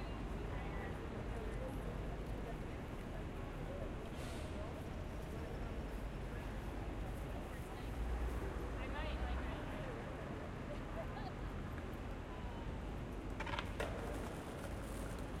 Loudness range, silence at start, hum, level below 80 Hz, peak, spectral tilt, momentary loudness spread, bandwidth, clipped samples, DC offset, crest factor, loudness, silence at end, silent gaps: 2 LU; 0 s; none; -48 dBFS; -24 dBFS; -6.5 dB/octave; 4 LU; 16 kHz; under 0.1%; under 0.1%; 20 dB; -46 LUFS; 0 s; none